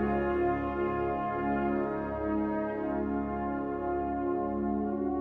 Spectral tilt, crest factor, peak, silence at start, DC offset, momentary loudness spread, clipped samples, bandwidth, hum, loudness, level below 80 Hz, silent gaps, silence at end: -10 dB/octave; 12 dB; -18 dBFS; 0 s; under 0.1%; 4 LU; under 0.1%; 4.4 kHz; none; -31 LUFS; -48 dBFS; none; 0 s